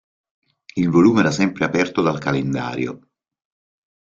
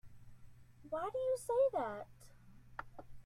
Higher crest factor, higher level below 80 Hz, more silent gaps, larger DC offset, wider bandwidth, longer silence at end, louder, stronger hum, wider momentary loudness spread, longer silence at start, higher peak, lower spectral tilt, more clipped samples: about the same, 18 dB vs 16 dB; first, -54 dBFS vs -64 dBFS; neither; neither; second, 7.6 kHz vs 13.5 kHz; first, 1.05 s vs 0.05 s; first, -19 LUFS vs -38 LUFS; neither; second, 12 LU vs 19 LU; first, 0.75 s vs 0.05 s; first, -2 dBFS vs -24 dBFS; first, -6.5 dB/octave vs -5 dB/octave; neither